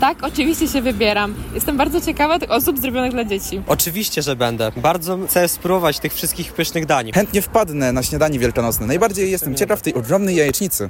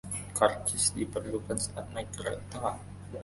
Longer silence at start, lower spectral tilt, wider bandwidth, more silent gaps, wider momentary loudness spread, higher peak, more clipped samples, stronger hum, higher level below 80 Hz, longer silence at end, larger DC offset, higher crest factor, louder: about the same, 0 s vs 0.05 s; about the same, -4 dB/octave vs -3.5 dB/octave; first, 16.5 kHz vs 12 kHz; neither; second, 4 LU vs 12 LU; first, -4 dBFS vs -8 dBFS; neither; neither; first, -36 dBFS vs -52 dBFS; about the same, 0 s vs 0 s; neither; second, 14 dB vs 24 dB; first, -18 LUFS vs -32 LUFS